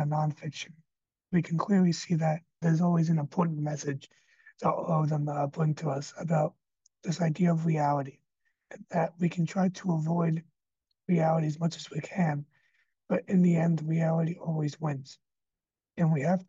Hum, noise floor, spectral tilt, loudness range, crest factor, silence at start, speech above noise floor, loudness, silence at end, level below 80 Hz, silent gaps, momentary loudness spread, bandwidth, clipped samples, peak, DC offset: none; under -90 dBFS; -7.5 dB/octave; 3 LU; 14 dB; 0 s; over 62 dB; -29 LUFS; 0.05 s; -76 dBFS; none; 10 LU; 7.6 kHz; under 0.1%; -14 dBFS; under 0.1%